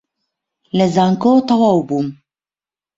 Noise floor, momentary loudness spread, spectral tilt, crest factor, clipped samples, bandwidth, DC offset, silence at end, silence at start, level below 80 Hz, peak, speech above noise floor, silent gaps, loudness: under -90 dBFS; 9 LU; -7.5 dB/octave; 16 dB; under 0.1%; 7.8 kHz; under 0.1%; 0.85 s; 0.75 s; -58 dBFS; -2 dBFS; over 76 dB; none; -15 LUFS